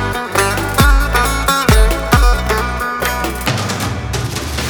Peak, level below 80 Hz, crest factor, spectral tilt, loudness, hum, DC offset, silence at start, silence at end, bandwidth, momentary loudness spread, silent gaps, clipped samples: 0 dBFS; -18 dBFS; 14 dB; -4 dB/octave; -15 LUFS; none; under 0.1%; 0 s; 0 s; over 20 kHz; 8 LU; none; under 0.1%